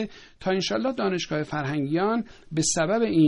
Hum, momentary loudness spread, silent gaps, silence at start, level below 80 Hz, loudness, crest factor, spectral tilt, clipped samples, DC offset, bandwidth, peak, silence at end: none; 7 LU; none; 0 s; -56 dBFS; -26 LUFS; 14 dB; -4.5 dB/octave; under 0.1%; under 0.1%; 10.5 kHz; -10 dBFS; 0 s